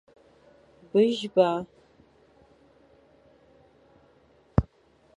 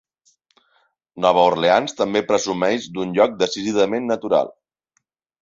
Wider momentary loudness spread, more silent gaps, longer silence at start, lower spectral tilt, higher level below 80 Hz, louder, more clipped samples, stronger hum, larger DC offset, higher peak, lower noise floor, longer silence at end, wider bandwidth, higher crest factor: first, 16 LU vs 7 LU; neither; second, 0.95 s vs 1.15 s; first, -7.5 dB/octave vs -4 dB/octave; first, -46 dBFS vs -60 dBFS; second, -25 LUFS vs -19 LUFS; neither; neither; neither; about the same, -4 dBFS vs -2 dBFS; second, -62 dBFS vs -71 dBFS; second, 0.55 s vs 0.9 s; first, 10.5 kHz vs 7.8 kHz; first, 26 dB vs 18 dB